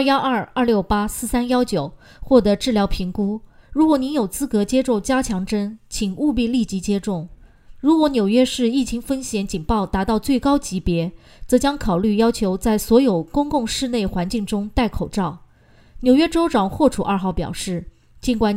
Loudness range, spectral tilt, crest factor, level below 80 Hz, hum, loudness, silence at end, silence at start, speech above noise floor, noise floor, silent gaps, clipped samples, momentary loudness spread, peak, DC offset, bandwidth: 2 LU; -5.5 dB/octave; 18 dB; -36 dBFS; none; -20 LUFS; 0 s; 0 s; 32 dB; -51 dBFS; none; under 0.1%; 9 LU; -2 dBFS; under 0.1%; 16 kHz